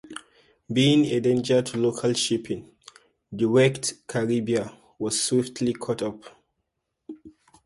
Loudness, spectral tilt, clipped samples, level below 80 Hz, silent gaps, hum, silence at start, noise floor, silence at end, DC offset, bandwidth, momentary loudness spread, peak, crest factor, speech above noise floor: -24 LUFS; -4.5 dB/octave; under 0.1%; -62 dBFS; none; none; 0.05 s; -79 dBFS; 0.35 s; under 0.1%; 11.5 kHz; 21 LU; -8 dBFS; 18 dB; 55 dB